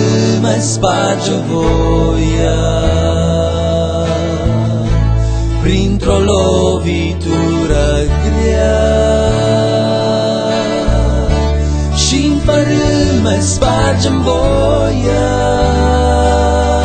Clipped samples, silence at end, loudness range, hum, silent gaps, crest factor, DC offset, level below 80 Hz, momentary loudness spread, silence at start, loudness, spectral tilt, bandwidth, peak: under 0.1%; 0 s; 2 LU; none; none; 12 dB; under 0.1%; -18 dBFS; 3 LU; 0 s; -13 LUFS; -5.5 dB/octave; 9.2 kHz; 0 dBFS